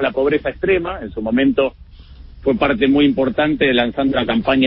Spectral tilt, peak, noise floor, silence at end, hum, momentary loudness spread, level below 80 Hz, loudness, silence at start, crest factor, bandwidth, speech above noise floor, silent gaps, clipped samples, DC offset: -11 dB/octave; -2 dBFS; -39 dBFS; 0 s; none; 7 LU; -38 dBFS; -17 LUFS; 0 s; 14 dB; 5.4 kHz; 23 dB; none; under 0.1%; under 0.1%